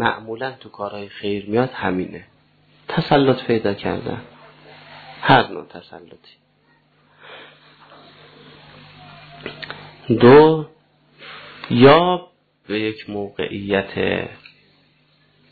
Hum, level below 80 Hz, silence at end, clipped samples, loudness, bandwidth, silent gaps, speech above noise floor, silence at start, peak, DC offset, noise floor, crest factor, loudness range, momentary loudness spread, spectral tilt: 50 Hz at -50 dBFS; -54 dBFS; 1.2 s; under 0.1%; -18 LUFS; 4.8 kHz; none; 41 dB; 0 s; 0 dBFS; under 0.1%; -59 dBFS; 20 dB; 10 LU; 26 LU; -9.5 dB/octave